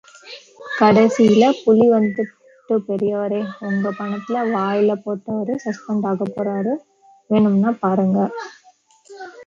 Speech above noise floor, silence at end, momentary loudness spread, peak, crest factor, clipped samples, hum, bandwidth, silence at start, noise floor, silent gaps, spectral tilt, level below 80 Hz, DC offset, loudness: 36 dB; 0.05 s; 15 LU; -2 dBFS; 16 dB; under 0.1%; none; 7.6 kHz; 0.25 s; -53 dBFS; none; -7 dB/octave; -64 dBFS; under 0.1%; -19 LUFS